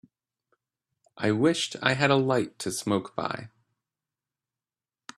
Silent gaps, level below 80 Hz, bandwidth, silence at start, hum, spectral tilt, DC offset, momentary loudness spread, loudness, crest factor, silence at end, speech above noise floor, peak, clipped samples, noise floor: none; -68 dBFS; 13.5 kHz; 1.15 s; none; -4.5 dB/octave; under 0.1%; 10 LU; -26 LUFS; 24 dB; 1.7 s; over 64 dB; -4 dBFS; under 0.1%; under -90 dBFS